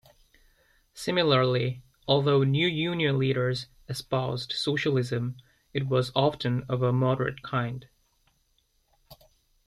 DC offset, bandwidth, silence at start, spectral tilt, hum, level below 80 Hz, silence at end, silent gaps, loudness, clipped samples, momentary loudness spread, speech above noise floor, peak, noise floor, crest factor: under 0.1%; 12.5 kHz; 0.95 s; -6.5 dB/octave; none; -60 dBFS; 0.5 s; none; -27 LUFS; under 0.1%; 12 LU; 44 dB; -8 dBFS; -70 dBFS; 20 dB